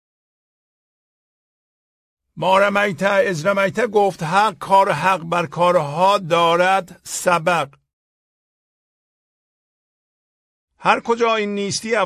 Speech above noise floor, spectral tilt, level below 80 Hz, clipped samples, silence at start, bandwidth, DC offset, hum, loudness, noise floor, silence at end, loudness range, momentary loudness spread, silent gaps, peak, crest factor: over 73 dB; -4 dB/octave; -62 dBFS; under 0.1%; 2.35 s; 15.5 kHz; under 0.1%; none; -18 LUFS; under -90 dBFS; 0 s; 8 LU; 7 LU; 7.93-10.68 s; 0 dBFS; 20 dB